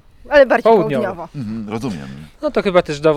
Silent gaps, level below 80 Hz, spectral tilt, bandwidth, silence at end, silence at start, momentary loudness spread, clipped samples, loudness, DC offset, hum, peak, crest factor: none; -44 dBFS; -6.5 dB/octave; 12.5 kHz; 0 s; 0.25 s; 15 LU; under 0.1%; -16 LUFS; under 0.1%; none; 0 dBFS; 16 dB